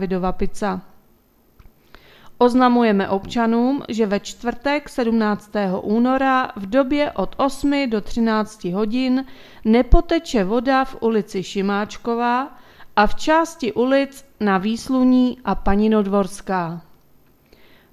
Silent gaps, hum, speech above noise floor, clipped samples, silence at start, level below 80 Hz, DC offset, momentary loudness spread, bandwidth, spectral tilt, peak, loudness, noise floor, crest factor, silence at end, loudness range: none; none; 37 dB; under 0.1%; 0 s; -34 dBFS; under 0.1%; 8 LU; 14 kHz; -6 dB/octave; 0 dBFS; -20 LUFS; -56 dBFS; 20 dB; 1.15 s; 2 LU